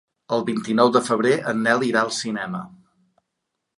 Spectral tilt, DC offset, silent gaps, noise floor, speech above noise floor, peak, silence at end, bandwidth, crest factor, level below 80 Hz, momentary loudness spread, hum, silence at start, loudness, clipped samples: -4.5 dB/octave; under 0.1%; none; -79 dBFS; 59 dB; -4 dBFS; 1.1 s; 11.5 kHz; 20 dB; -70 dBFS; 10 LU; none; 0.3 s; -21 LUFS; under 0.1%